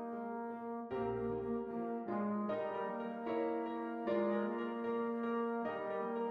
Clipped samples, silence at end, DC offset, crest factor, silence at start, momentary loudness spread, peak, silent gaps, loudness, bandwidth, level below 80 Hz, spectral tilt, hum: under 0.1%; 0 s; under 0.1%; 14 dB; 0 s; 6 LU; -26 dBFS; none; -39 LUFS; 5.2 kHz; -70 dBFS; -9 dB/octave; none